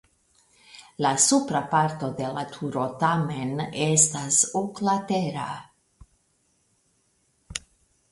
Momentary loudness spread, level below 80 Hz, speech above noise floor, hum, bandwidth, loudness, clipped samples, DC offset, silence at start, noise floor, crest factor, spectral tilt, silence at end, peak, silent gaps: 17 LU; -60 dBFS; 44 dB; none; 11.5 kHz; -24 LUFS; under 0.1%; under 0.1%; 0.7 s; -68 dBFS; 22 dB; -3.5 dB/octave; 0.55 s; -4 dBFS; none